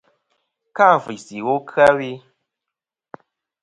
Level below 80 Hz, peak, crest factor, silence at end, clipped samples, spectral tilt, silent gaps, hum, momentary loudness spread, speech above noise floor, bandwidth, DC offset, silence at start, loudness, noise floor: -62 dBFS; 0 dBFS; 20 dB; 1.45 s; under 0.1%; -5.5 dB/octave; none; none; 18 LU; 68 dB; 11 kHz; under 0.1%; 0.75 s; -17 LUFS; -85 dBFS